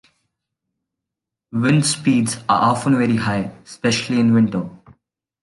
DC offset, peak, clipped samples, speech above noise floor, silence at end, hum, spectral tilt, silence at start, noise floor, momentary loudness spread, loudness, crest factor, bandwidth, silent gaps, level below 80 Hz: under 0.1%; -4 dBFS; under 0.1%; 67 dB; 0.65 s; none; -5 dB/octave; 1.55 s; -84 dBFS; 10 LU; -18 LUFS; 16 dB; 11.5 kHz; none; -54 dBFS